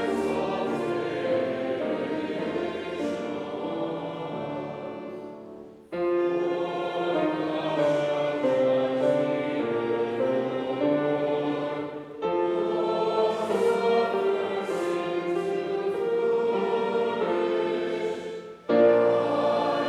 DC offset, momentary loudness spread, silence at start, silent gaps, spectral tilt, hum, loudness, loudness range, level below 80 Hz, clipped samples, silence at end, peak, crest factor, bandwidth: under 0.1%; 10 LU; 0 s; none; -6.5 dB/octave; none; -27 LUFS; 6 LU; -68 dBFS; under 0.1%; 0 s; -10 dBFS; 18 dB; 12 kHz